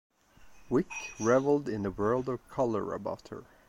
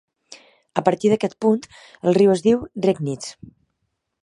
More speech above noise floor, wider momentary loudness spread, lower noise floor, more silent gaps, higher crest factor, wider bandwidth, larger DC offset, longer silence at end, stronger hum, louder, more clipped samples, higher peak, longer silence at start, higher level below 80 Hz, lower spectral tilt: second, 26 dB vs 56 dB; about the same, 11 LU vs 12 LU; second, -56 dBFS vs -75 dBFS; neither; about the same, 20 dB vs 20 dB; first, 12.5 kHz vs 11 kHz; neither; second, 0.25 s vs 0.9 s; neither; second, -31 LUFS vs -20 LUFS; neither; second, -12 dBFS vs 0 dBFS; first, 0.45 s vs 0.3 s; about the same, -58 dBFS vs -58 dBFS; about the same, -6.5 dB/octave vs -6.5 dB/octave